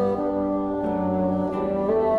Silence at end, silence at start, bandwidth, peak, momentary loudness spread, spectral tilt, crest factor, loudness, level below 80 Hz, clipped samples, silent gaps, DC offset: 0 s; 0 s; 5.2 kHz; -12 dBFS; 2 LU; -10 dB/octave; 12 dB; -24 LUFS; -48 dBFS; under 0.1%; none; under 0.1%